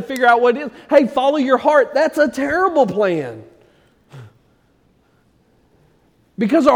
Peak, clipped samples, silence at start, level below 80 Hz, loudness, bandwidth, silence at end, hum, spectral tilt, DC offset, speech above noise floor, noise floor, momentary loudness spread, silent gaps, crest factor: 0 dBFS; under 0.1%; 0 s; -56 dBFS; -16 LUFS; 15 kHz; 0 s; none; -5.5 dB/octave; under 0.1%; 42 dB; -57 dBFS; 10 LU; none; 16 dB